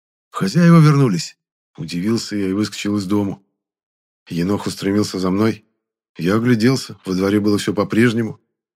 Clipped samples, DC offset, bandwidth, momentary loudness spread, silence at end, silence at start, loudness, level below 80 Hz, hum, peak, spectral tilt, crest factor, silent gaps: under 0.1%; under 0.1%; 15 kHz; 14 LU; 0.4 s; 0.35 s; -18 LUFS; -58 dBFS; none; 0 dBFS; -6.5 dB/octave; 18 dB; 1.52-1.74 s, 3.83-4.26 s, 6.09-6.15 s